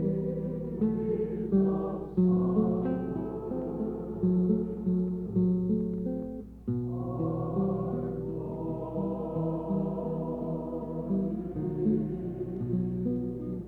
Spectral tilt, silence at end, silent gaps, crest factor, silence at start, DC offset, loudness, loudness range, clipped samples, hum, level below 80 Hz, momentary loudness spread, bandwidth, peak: -12.5 dB/octave; 0 s; none; 16 dB; 0 s; under 0.1%; -31 LUFS; 4 LU; under 0.1%; none; -50 dBFS; 8 LU; 2.8 kHz; -14 dBFS